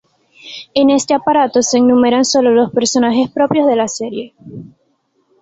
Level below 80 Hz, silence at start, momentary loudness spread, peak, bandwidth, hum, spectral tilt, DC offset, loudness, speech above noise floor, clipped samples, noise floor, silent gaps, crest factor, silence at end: -54 dBFS; 0.45 s; 20 LU; 0 dBFS; 8 kHz; none; -3.5 dB/octave; under 0.1%; -13 LUFS; 48 dB; under 0.1%; -61 dBFS; none; 14 dB; 0.75 s